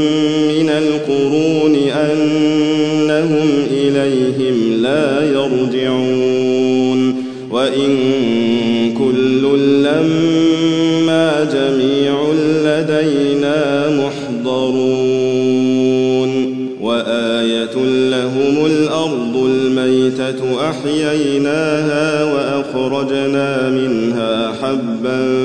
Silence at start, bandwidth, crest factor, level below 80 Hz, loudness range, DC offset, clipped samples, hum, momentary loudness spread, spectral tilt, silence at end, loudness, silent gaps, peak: 0 s; 9.8 kHz; 12 dB; -58 dBFS; 2 LU; 0.4%; under 0.1%; none; 4 LU; -6 dB/octave; 0 s; -15 LUFS; none; -2 dBFS